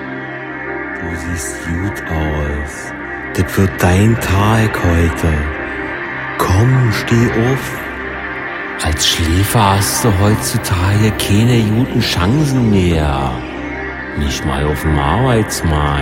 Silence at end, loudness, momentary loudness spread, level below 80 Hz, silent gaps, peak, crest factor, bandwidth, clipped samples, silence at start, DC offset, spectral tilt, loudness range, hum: 0 s; -15 LUFS; 11 LU; -28 dBFS; none; 0 dBFS; 14 dB; 16.5 kHz; under 0.1%; 0 s; under 0.1%; -5 dB/octave; 4 LU; none